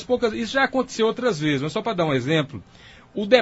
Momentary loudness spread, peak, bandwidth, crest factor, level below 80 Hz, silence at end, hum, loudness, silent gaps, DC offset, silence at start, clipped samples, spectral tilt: 10 LU; 0 dBFS; 8 kHz; 22 dB; -54 dBFS; 0 s; none; -23 LUFS; none; under 0.1%; 0 s; under 0.1%; -5.5 dB/octave